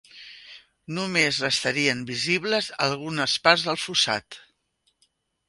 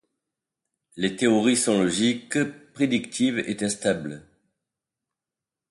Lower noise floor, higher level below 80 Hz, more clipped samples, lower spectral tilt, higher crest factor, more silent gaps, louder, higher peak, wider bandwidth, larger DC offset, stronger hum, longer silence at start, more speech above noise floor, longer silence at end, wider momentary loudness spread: second, -71 dBFS vs -89 dBFS; about the same, -64 dBFS vs -62 dBFS; neither; about the same, -3 dB/octave vs -4 dB/octave; first, 26 dB vs 18 dB; neither; about the same, -23 LUFS vs -24 LUFS; first, -2 dBFS vs -8 dBFS; about the same, 11.5 kHz vs 11.5 kHz; neither; neither; second, 0.15 s vs 0.95 s; second, 47 dB vs 65 dB; second, 1.1 s vs 1.5 s; first, 15 LU vs 9 LU